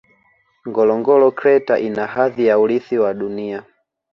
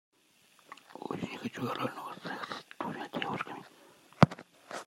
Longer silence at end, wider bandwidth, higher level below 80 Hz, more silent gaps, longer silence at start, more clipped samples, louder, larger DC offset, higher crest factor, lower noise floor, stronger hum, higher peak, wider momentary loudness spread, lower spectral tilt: first, 0.5 s vs 0.05 s; second, 6 kHz vs 16 kHz; about the same, -62 dBFS vs -66 dBFS; neither; about the same, 0.65 s vs 0.7 s; neither; first, -17 LUFS vs -34 LUFS; neither; second, 14 dB vs 34 dB; second, -59 dBFS vs -66 dBFS; neither; about the same, -2 dBFS vs -2 dBFS; second, 12 LU vs 23 LU; first, -8 dB/octave vs -6.5 dB/octave